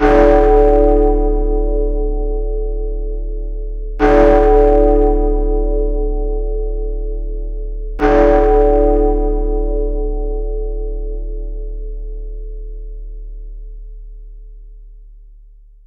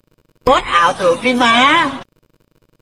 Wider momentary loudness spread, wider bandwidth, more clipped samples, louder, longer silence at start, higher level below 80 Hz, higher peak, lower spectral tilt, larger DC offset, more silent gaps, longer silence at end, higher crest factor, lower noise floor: first, 21 LU vs 10 LU; second, 4.4 kHz vs 15 kHz; neither; about the same, -15 LUFS vs -13 LUFS; second, 0 s vs 0.45 s; first, -18 dBFS vs -42 dBFS; about the same, 0 dBFS vs 0 dBFS; first, -9 dB/octave vs -3 dB/octave; neither; neither; second, 0.65 s vs 0.8 s; about the same, 14 dB vs 16 dB; second, -41 dBFS vs -57 dBFS